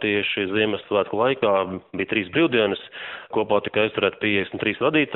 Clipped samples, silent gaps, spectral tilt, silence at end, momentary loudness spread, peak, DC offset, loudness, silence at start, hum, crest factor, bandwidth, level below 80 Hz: under 0.1%; none; -3 dB/octave; 0 s; 8 LU; -6 dBFS; under 0.1%; -22 LUFS; 0 s; none; 18 dB; 4.1 kHz; -60 dBFS